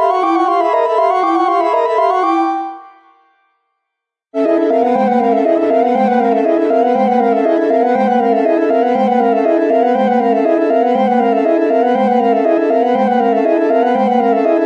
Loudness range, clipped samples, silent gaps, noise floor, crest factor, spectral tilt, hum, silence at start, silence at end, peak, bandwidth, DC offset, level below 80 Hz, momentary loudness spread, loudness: 4 LU; under 0.1%; none; -78 dBFS; 12 dB; -7.5 dB/octave; none; 0 s; 0 s; -2 dBFS; 8.4 kHz; under 0.1%; -72 dBFS; 1 LU; -13 LUFS